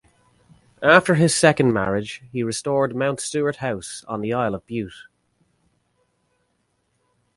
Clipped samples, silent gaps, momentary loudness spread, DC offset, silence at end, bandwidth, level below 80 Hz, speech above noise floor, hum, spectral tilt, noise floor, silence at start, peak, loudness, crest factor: under 0.1%; none; 15 LU; under 0.1%; 2.35 s; 11.5 kHz; -56 dBFS; 49 dB; none; -4.5 dB/octave; -70 dBFS; 0.8 s; 0 dBFS; -21 LUFS; 22 dB